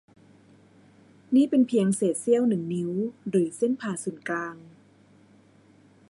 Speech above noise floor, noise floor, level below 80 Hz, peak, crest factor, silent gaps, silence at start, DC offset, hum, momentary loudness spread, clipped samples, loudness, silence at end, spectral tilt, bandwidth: 32 dB; -57 dBFS; -74 dBFS; -10 dBFS; 16 dB; none; 1.3 s; under 0.1%; none; 10 LU; under 0.1%; -25 LUFS; 1.45 s; -6 dB/octave; 11.5 kHz